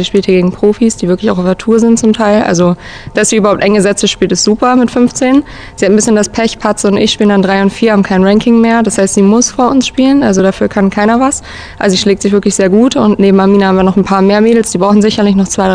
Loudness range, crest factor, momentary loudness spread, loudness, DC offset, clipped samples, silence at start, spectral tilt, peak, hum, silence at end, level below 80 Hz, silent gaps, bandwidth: 2 LU; 8 dB; 5 LU; -9 LUFS; 0.2%; 2%; 0 s; -5 dB/octave; 0 dBFS; none; 0 s; -36 dBFS; none; 10 kHz